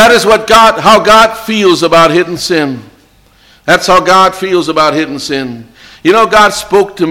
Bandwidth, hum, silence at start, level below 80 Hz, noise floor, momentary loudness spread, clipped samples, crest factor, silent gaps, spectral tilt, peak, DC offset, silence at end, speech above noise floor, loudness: 17.5 kHz; none; 0 s; -38 dBFS; -45 dBFS; 12 LU; 0.4%; 8 dB; none; -3.5 dB/octave; 0 dBFS; under 0.1%; 0 s; 37 dB; -7 LUFS